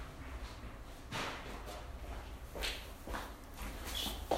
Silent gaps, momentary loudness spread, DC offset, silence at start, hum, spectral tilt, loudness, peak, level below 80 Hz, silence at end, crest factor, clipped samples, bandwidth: none; 10 LU; under 0.1%; 0 s; none; -3.5 dB/octave; -44 LUFS; -20 dBFS; -48 dBFS; 0 s; 24 dB; under 0.1%; 16 kHz